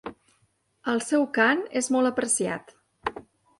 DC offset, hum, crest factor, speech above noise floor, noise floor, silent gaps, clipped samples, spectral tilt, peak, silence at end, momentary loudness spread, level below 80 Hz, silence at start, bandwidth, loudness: under 0.1%; none; 20 dB; 45 dB; -69 dBFS; none; under 0.1%; -3 dB/octave; -8 dBFS; 0.4 s; 14 LU; -64 dBFS; 0.05 s; 11.5 kHz; -25 LUFS